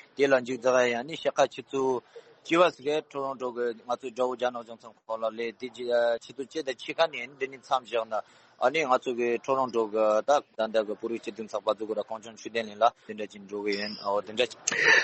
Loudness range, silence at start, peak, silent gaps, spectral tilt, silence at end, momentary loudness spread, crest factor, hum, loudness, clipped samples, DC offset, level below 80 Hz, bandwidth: 4 LU; 0.2 s; -8 dBFS; none; -3 dB/octave; 0 s; 11 LU; 20 dB; none; -28 LUFS; under 0.1%; under 0.1%; -74 dBFS; 8.4 kHz